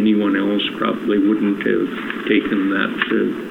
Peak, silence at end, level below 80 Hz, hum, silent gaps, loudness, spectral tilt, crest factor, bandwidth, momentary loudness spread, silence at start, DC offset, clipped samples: -2 dBFS; 0 s; -56 dBFS; none; none; -19 LUFS; -7 dB/octave; 16 dB; 5.2 kHz; 4 LU; 0 s; under 0.1%; under 0.1%